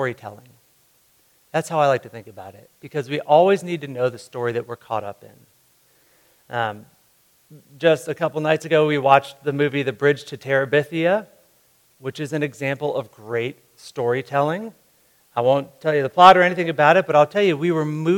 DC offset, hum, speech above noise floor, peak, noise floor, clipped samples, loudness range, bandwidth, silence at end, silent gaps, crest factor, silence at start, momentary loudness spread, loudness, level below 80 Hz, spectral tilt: under 0.1%; none; 40 dB; 0 dBFS; -59 dBFS; under 0.1%; 10 LU; 18.5 kHz; 0 s; none; 20 dB; 0 s; 15 LU; -20 LUFS; -68 dBFS; -6 dB/octave